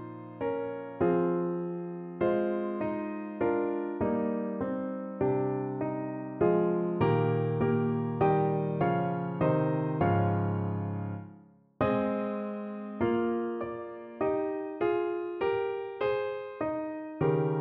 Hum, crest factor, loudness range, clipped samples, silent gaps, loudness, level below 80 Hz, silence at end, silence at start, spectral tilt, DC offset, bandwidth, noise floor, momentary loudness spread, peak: none; 16 dB; 4 LU; under 0.1%; none; -31 LUFS; -60 dBFS; 0 s; 0 s; -11.5 dB/octave; under 0.1%; 4.5 kHz; -55 dBFS; 9 LU; -14 dBFS